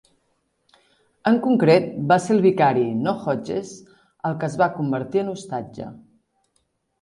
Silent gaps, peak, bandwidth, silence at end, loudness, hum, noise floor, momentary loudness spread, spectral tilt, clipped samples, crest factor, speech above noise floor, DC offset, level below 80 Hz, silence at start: none; -4 dBFS; 11.5 kHz; 1.05 s; -21 LUFS; none; -70 dBFS; 14 LU; -7 dB/octave; under 0.1%; 18 dB; 50 dB; under 0.1%; -62 dBFS; 1.25 s